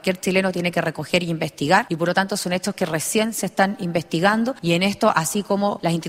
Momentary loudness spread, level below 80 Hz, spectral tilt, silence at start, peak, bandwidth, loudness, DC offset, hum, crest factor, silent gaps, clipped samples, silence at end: 5 LU; -58 dBFS; -4.5 dB/octave; 0.05 s; -2 dBFS; 16 kHz; -21 LUFS; under 0.1%; none; 18 dB; none; under 0.1%; 0 s